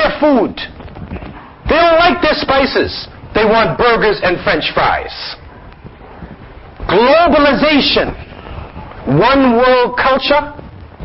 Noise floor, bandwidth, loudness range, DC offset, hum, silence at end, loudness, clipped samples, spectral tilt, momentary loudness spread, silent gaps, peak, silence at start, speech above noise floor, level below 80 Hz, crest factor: -35 dBFS; 5.8 kHz; 3 LU; under 0.1%; none; 0 s; -11 LUFS; under 0.1%; -2.5 dB/octave; 20 LU; none; 0 dBFS; 0 s; 23 dB; -34 dBFS; 14 dB